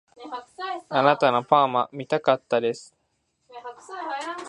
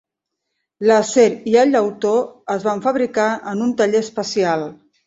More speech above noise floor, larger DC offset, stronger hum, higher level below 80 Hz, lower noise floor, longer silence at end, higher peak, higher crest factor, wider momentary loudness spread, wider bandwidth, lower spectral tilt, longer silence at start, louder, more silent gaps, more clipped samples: second, 49 dB vs 62 dB; neither; neither; second, -74 dBFS vs -62 dBFS; second, -73 dBFS vs -79 dBFS; second, 0 s vs 0.35 s; about the same, -2 dBFS vs -2 dBFS; first, 22 dB vs 16 dB; first, 19 LU vs 8 LU; first, 11 kHz vs 8 kHz; about the same, -5 dB/octave vs -4.5 dB/octave; second, 0.2 s vs 0.8 s; second, -23 LUFS vs -18 LUFS; neither; neither